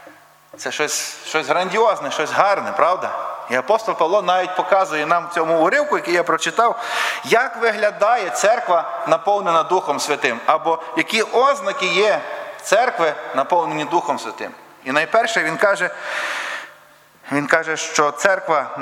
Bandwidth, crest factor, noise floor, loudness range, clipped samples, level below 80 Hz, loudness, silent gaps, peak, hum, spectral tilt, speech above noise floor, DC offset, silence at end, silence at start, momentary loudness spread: 16 kHz; 18 dB; -49 dBFS; 2 LU; under 0.1%; -70 dBFS; -18 LUFS; none; 0 dBFS; none; -2.5 dB/octave; 30 dB; under 0.1%; 0 s; 0 s; 7 LU